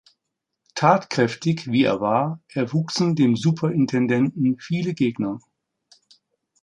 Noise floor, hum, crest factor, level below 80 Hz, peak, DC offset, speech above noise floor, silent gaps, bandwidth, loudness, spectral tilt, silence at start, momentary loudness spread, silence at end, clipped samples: -81 dBFS; none; 20 dB; -64 dBFS; -2 dBFS; under 0.1%; 60 dB; none; 10 kHz; -22 LUFS; -6.5 dB/octave; 0.75 s; 8 LU; 1.25 s; under 0.1%